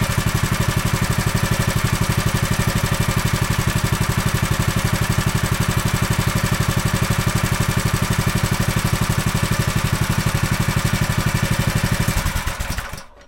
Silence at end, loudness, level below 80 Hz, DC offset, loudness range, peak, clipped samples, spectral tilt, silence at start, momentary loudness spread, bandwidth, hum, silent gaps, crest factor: 0.05 s; -20 LUFS; -28 dBFS; under 0.1%; 0 LU; -4 dBFS; under 0.1%; -4.5 dB/octave; 0 s; 1 LU; 17 kHz; none; none; 14 dB